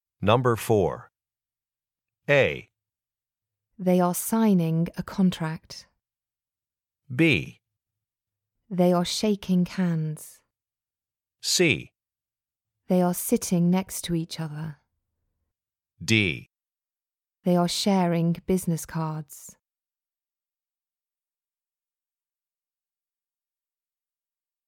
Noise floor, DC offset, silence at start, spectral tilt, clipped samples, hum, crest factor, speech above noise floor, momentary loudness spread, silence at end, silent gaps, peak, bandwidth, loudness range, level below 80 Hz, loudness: under -90 dBFS; under 0.1%; 0.2 s; -5 dB/octave; under 0.1%; none; 24 dB; over 66 dB; 15 LU; 5.15 s; none; -4 dBFS; 17.5 kHz; 5 LU; -58 dBFS; -24 LUFS